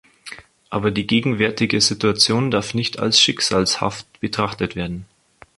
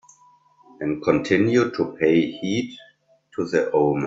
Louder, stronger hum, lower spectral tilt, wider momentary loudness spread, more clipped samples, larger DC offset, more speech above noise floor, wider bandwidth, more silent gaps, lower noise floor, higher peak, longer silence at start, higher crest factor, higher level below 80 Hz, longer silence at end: first, -19 LUFS vs -22 LUFS; neither; second, -3.5 dB/octave vs -6.5 dB/octave; about the same, 14 LU vs 12 LU; neither; neither; second, 21 dB vs 35 dB; first, 11.5 kHz vs 7.8 kHz; neither; second, -40 dBFS vs -56 dBFS; first, 0 dBFS vs -4 dBFS; second, 0.25 s vs 0.8 s; about the same, 20 dB vs 18 dB; first, -48 dBFS vs -60 dBFS; first, 0.55 s vs 0 s